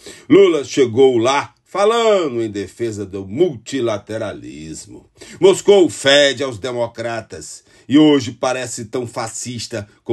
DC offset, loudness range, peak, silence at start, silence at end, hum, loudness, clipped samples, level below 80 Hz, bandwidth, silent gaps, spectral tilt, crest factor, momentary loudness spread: under 0.1%; 5 LU; 0 dBFS; 0.05 s; 0 s; none; -16 LUFS; under 0.1%; -58 dBFS; 12.5 kHz; none; -4.5 dB/octave; 16 dB; 16 LU